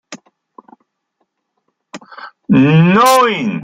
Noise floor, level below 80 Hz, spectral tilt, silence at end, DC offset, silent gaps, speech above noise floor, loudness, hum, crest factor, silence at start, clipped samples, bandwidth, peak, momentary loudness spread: -69 dBFS; -54 dBFS; -6 dB/octave; 0 s; under 0.1%; none; 59 dB; -10 LUFS; none; 14 dB; 0.1 s; under 0.1%; 16.5 kHz; 0 dBFS; 24 LU